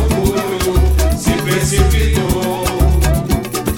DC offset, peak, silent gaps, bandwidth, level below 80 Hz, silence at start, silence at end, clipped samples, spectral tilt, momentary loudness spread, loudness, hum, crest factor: under 0.1%; -2 dBFS; none; 17.5 kHz; -16 dBFS; 0 s; 0 s; under 0.1%; -5.5 dB/octave; 4 LU; -15 LUFS; none; 12 dB